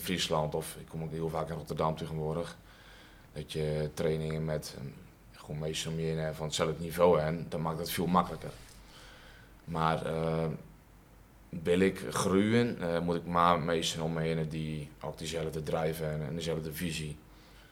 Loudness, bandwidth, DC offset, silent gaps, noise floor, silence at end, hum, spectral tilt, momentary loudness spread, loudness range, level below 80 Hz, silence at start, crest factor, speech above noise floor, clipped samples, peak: -33 LUFS; 17.5 kHz; under 0.1%; none; -57 dBFS; 0.05 s; none; -5.5 dB/octave; 18 LU; 7 LU; -56 dBFS; 0 s; 24 dB; 25 dB; under 0.1%; -10 dBFS